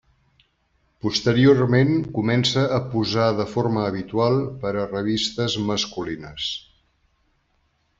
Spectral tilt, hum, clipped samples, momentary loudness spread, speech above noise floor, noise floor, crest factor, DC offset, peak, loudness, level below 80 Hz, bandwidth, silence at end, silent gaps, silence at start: -6 dB/octave; none; under 0.1%; 11 LU; 46 dB; -67 dBFS; 18 dB; under 0.1%; -4 dBFS; -22 LUFS; -54 dBFS; 7.8 kHz; 1.4 s; none; 1.05 s